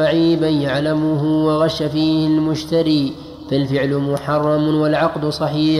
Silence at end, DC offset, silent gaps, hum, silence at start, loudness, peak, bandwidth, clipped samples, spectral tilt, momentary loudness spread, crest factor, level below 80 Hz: 0 s; under 0.1%; none; none; 0 s; -17 LUFS; -4 dBFS; 12 kHz; under 0.1%; -7 dB/octave; 4 LU; 12 dB; -46 dBFS